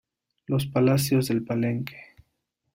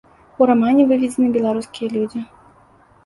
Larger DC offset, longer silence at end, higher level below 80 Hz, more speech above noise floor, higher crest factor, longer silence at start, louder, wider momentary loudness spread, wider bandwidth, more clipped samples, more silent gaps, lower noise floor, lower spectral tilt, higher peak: neither; about the same, 0.7 s vs 0.8 s; about the same, -58 dBFS vs -58 dBFS; first, 53 dB vs 35 dB; about the same, 16 dB vs 16 dB; about the same, 0.5 s vs 0.4 s; second, -25 LUFS vs -17 LUFS; second, 9 LU vs 12 LU; first, 16 kHz vs 11.5 kHz; neither; neither; first, -77 dBFS vs -51 dBFS; about the same, -6.5 dB/octave vs -6.5 dB/octave; second, -10 dBFS vs -2 dBFS